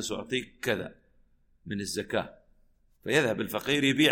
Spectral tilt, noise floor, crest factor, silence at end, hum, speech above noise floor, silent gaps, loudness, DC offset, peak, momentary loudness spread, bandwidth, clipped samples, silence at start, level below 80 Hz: -4 dB/octave; -64 dBFS; 22 dB; 0 s; none; 35 dB; none; -29 LUFS; under 0.1%; -8 dBFS; 14 LU; 16.5 kHz; under 0.1%; 0 s; -60 dBFS